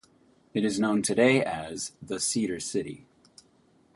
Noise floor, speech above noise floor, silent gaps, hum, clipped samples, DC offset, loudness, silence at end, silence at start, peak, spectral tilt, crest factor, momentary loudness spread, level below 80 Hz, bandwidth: -63 dBFS; 36 dB; none; none; under 0.1%; under 0.1%; -27 LUFS; 1 s; 0.55 s; -8 dBFS; -4 dB/octave; 20 dB; 13 LU; -64 dBFS; 11.5 kHz